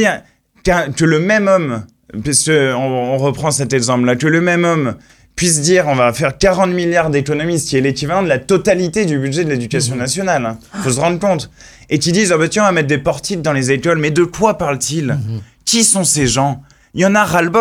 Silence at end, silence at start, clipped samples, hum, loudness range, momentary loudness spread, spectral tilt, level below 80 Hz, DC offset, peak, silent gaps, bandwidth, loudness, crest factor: 0 s; 0 s; under 0.1%; none; 2 LU; 9 LU; -4 dB/octave; -40 dBFS; under 0.1%; 0 dBFS; none; 17 kHz; -14 LUFS; 14 dB